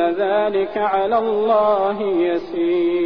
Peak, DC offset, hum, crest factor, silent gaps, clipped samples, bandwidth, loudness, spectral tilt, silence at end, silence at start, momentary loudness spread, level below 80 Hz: -6 dBFS; 0.5%; none; 12 dB; none; under 0.1%; 5.4 kHz; -19 LUFS; -8 dB/octave; 0 s; 0 s; 4 LU; -56 dBFS